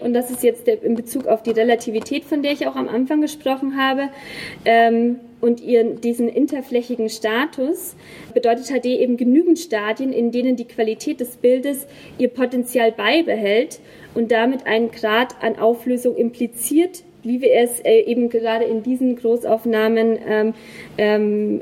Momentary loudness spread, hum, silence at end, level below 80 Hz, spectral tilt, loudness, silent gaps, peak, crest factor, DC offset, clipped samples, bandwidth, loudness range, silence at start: 8 LU; none; 0 s; -64 dBFS; -4 dB/octave; -19 LUFS; none; -2 dBFS; 16 dB; under 0.1%; under 0.1%; 16.5 kHz; 2 LU; 0 s